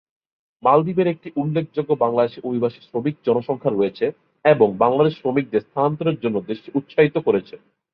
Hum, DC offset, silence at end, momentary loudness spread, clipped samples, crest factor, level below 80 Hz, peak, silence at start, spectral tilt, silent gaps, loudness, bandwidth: none; under 0.1%; 0.4 s; 9 LU; under 0.1%; 18 dB; -62 dBFS; -2 dBFS; 0.65 s; -10.5 dB/octave; none; -20 LUFS; 5.4 kHz